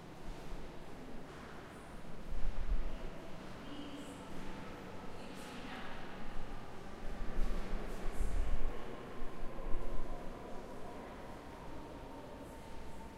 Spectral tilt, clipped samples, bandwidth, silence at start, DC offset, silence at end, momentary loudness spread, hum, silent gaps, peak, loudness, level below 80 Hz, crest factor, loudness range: -5.5 dB/octave; under 0.1%; 10 kHz; 0 s; under 0.1%; 0 s; 8 LU; none; none; -18 dBFS; -48 LUFS; -42 dBFS; 18 dB; 3 LU